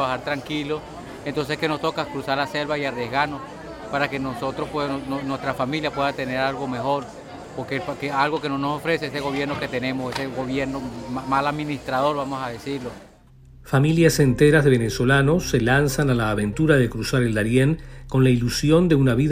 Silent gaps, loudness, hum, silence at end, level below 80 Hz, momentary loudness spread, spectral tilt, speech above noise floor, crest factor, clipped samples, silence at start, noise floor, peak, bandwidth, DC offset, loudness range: none; -22 LUFS; none; 0 s; -42 dBFS; 12 LU; -6 dB/octave; 27 dB; 20 dB; under 0.1%; 0 s; -48 dBFS; -2 dBFS; 16 kHz; under 0.1%; 7 LU